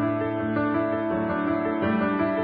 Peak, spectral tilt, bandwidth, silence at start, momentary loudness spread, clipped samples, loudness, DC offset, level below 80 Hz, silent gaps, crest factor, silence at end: -12 dBFS; -11.5 dB/octave; 4.9 kHz; 0 s; 2 LU; under 0.1%; -25 LUFS; under 0.1%; -52 dBFS; none; 12 dB; 0 s